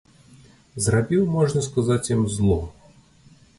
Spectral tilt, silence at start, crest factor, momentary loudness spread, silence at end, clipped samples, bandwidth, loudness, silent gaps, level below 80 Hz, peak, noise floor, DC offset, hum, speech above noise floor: -6 dB/octave; 0.75 s; 16 dB; 6 LU; 0.9 s; under 0.1%; 11.5 kHz; -22 LUFS; none; -40 dBFS; -8 dBFS; -53 dBFS; under 0.1%; none; 32 dB